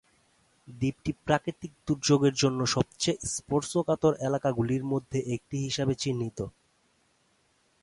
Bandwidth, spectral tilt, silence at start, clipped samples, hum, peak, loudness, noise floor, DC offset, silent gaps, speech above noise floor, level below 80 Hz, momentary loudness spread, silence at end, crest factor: 11.5 kHz; -5 dB/octave; 0.7 s; under 0.1%; none; -8 dBFS; -29 LUFS; -69 dBFS; under 0.1%; none; 41 dB; -56 dBFS; 9 LU; 1.35 s; 20 dB